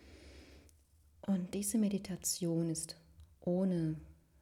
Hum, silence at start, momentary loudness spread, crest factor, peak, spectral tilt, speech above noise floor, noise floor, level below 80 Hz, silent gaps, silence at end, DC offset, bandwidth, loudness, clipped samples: none; 0.05 s; 22 LU; 16 dB; -22 dBFS; -5.5 dB/octave; 31 dB; -66 dBFS; -64 dBFS; none; 0.3 s; under 0.1%; 16.5 kHz; -37 LUFS; under 0.1%